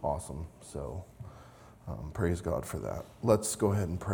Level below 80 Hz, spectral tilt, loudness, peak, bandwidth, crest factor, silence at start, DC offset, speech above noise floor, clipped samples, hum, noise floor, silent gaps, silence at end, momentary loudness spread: -50 dBFS; -6 dB/octave; -33 LUFS; -10 dBFS; 19 kHz; 24 dB; 0 s; under 0.1%; 21 dB; under 0.1%; none; -54 dBFS; none; 0 s; 21 LU